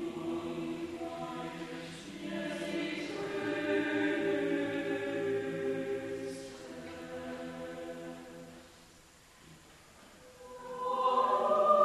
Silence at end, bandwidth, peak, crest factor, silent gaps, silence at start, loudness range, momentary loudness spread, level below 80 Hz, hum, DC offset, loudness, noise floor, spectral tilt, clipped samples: 0 s; 13 kHz; -14 dBFS; 22 dB; none; 0 s; 13 LU; 23 LU; -68 dBFS; none; under 0.1%; -35 LUFS; -59 dBFS; -5 dB/octave; under 0.1%